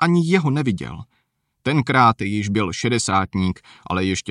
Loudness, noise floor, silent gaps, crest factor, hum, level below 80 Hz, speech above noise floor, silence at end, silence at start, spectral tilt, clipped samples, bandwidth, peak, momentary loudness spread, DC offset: -20 LUFS; -56 dBFS; none; 18 dB; none; -50 dBFS; 36 dB; 0 s; 0 s; -5.5 dB/octave; under 0.1%; 11 kHz; -2 dBFS; 12 LU; under 0.1%